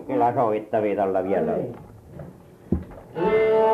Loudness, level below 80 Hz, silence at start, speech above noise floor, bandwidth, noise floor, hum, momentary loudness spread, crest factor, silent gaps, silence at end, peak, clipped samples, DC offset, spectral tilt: -23 LUFS; -46 dBFS; 0 s; 23 dB; 5.2 kHz; -44 dBFS; none; 21 LU; 14 dB; none; 0 s; -10 dBFS; under 0.1%; under 0.1%; -8.5 dB/octave